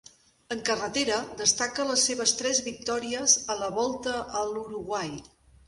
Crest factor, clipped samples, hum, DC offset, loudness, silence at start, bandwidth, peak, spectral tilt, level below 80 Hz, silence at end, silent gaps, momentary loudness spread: 22 dB; under 0.1%; none; under 0.1%; -26 LUFS; 0.5 s; 11.5 kHz; -6 dBFS; -1 dB/octave; -60 dBFS; 0.45 s; none; 10 LU